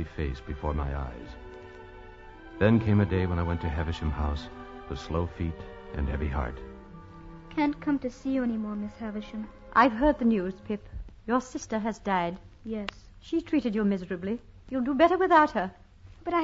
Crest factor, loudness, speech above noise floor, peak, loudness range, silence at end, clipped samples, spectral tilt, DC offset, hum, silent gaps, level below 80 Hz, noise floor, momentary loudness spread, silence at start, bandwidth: 22 dB; -28 LUFS; 19 dB; -8 dBFS; 6 LU; 0 s; under 0.1%; -7.5 dB/octave; under 0.1%; none; none; -40 dBFS; -47 dBFS; 22 LU; 0 s; 7.8 kHz